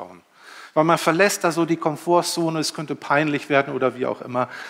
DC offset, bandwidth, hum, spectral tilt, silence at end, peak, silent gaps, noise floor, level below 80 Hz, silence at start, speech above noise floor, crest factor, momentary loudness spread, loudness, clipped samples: under 0.1%; 16.5 kHz; none; -4.5 dB/octave; 0 s; -2 dBFS; none; -45 dBFS; -76 dBFS; 0 s; 24 dB; 20 dB; 8 LU; -21 LUFS; under 0.1%